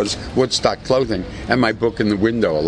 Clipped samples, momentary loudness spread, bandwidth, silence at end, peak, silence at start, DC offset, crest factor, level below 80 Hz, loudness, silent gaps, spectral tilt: under 0.1%; 4 LU; 10.5 kHz; 0 s; -2 dBFS; 0 s; under 0.1%; 18 dB; -38 dBFS; -19 LUFS; none; -5 dB/octave